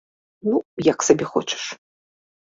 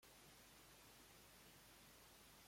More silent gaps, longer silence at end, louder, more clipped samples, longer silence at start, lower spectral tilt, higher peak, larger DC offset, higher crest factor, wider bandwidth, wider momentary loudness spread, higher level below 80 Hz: first, 0.65-0.77 s vs none; first, 0.75 s vs 0 s; first, -22 LUFS vs -65 LUFS; neither; first, 0.45 s vs 0 s; first, -4 dB/octave vs -2 dB/octave; first, -2 dBFS vs -54 dBFS; neither; first, 22 dB vs 14 dB; second, 7.8 kHz vs 16.5 kHz; first, 12 LU vs 0 LU; first, -60 dBFS vs -80 dBFS